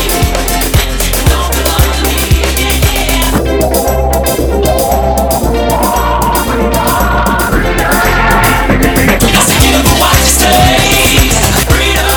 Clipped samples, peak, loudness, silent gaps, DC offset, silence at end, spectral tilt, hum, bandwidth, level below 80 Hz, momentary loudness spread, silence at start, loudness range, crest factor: 0.5%; 0 dBFS; -9 LUFS; none; under 0.1%; 0 s; -3.5 dB/octave; none; over 20 kHz; -14 dBFS; 5 LU; 0 s; 4 LU; 8 dB